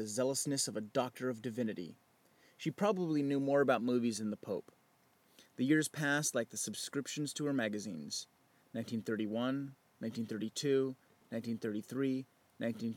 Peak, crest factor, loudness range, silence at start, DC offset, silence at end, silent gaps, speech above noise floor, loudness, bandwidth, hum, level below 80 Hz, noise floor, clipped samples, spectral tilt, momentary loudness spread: -18 dBFS; 20 dB; 4 LU; 0 s; under 0.1%; 0 s; none; 35 dB; -37 LUFS; 17.5 kHz; none; -90 dBFS; -71 dBFS; under 0.1%; -4.5 dB/octave; 12 LU